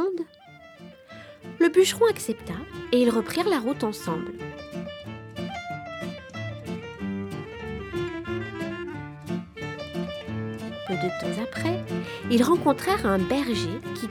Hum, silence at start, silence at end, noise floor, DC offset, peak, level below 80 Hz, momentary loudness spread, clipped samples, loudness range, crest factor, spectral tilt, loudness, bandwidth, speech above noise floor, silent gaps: none; 0 s; 0 s; -49 dBFS; under 0.1%; -8 dBFS; -52 dBFS; 16 LU; under 0.1%; 10 LU; 20 dB; -5.5 dB/octave; -27 LUFS; 19.5 kHz; 25 dB; none